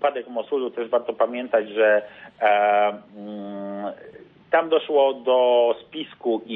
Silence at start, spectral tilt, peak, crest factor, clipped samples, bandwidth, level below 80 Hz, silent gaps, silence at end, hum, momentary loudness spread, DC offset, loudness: 0 s; -7.5 dB/octave; -6 dBFS; 16 dB; under 0.1%; 4 kHz; -72 dBFS; none; 0 s; none; 16 LU; under 0.1%; -22 LUFS